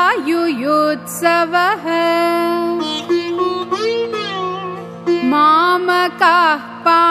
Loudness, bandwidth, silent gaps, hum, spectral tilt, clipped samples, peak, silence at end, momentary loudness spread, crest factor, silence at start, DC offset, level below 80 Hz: -15 LUFS; 15.5 kHz; none; 50 Hz at -55 dBFS; -4 dB/octave; under 0.1%; 0 dBFS; 0 s; 9 LU; 14 dB; 0 s; under 0.1%; -70 dBFS